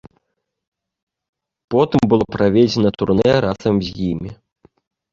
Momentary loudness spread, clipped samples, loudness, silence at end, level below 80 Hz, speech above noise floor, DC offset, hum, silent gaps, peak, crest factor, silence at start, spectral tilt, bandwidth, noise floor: 9 LU; under 0.1%; -17 LUFS; 0.8 s; -44 dBFS; 59 dB; under 0.1%; none; none; -2 dBFS; 18 dB; 1.7 s; -7.5 dB/octave; 7.6 kHz; -75 dBFS